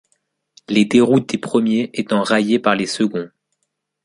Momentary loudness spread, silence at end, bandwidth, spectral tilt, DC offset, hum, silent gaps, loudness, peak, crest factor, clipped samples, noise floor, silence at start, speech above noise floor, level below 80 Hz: 7 LU; 0.8 s; 11.5 kHz; -5.5 dB/octave; under 0.1%; none; none; -17 LUFS; -2 dBFS; 16 dB; under 0.1%; -74 dBFS; 0.7 s; 57 dB; -60 dBFS